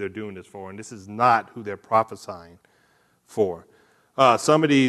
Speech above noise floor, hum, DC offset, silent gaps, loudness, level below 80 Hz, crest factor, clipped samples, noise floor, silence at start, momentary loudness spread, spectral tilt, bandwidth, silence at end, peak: 40 dB; none; under 0.1%; none; -21 LUFS; -68 dBFS; 20 dB; under 0.1%; -63 dBFS; 0 s; 20 LU; -5 dB/octave; 13 kHz; 0 s; -4 dBFS